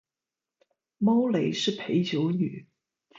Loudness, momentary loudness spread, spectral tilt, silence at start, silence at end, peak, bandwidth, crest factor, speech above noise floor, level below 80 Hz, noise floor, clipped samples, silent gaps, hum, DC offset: -26 LUFS; 7 LU; -6 dB/octave; 1 s; 0.55 s; -14 dBFS; 7.8 kHz; 14 dB; over 65 dB; -72 dBFS; under -90 dBFS; under 0.1%; none; none; under 0.1%